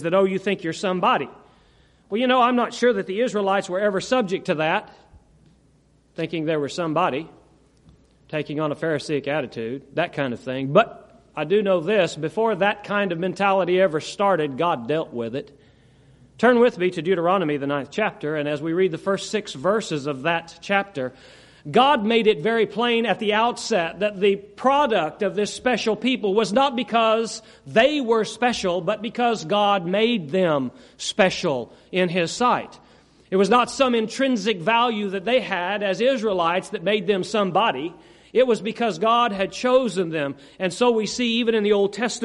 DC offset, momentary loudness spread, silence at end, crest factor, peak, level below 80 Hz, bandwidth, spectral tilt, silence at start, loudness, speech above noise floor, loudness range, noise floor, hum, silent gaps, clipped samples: under 0.1%; 9 LU; 0 s; 20 dB; -2 dBFS; -60 dBFS; 11.5 kHz; -5 dB/octave; 0 s; -22 LUFS; 37 dB; 5 LU; -59 dBFS; none; none; under 0.1%